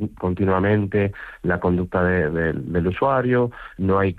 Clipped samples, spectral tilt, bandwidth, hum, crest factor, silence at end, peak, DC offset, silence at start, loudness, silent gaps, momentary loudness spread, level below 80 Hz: under 0.1%; -10 dB/octave; 4.5 kHz; none; 14 dB; 0 s; -8 dBFS; under 0.1%; 0 s; -21 LUFS; none; 7 LU; -46 dBFS